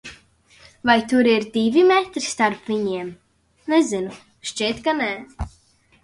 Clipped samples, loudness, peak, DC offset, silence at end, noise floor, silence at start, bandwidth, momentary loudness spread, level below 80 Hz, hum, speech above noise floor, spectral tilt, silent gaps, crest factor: under 0.1%; -20 LUFS; -4 dBFS; under 0.1%; 0.55 s; -53 dBFS; 0.05 s; 11.5 kHz; 18 LU; -46 dBFS; none; 33 dB; -4 dB/octave; none; 18 dB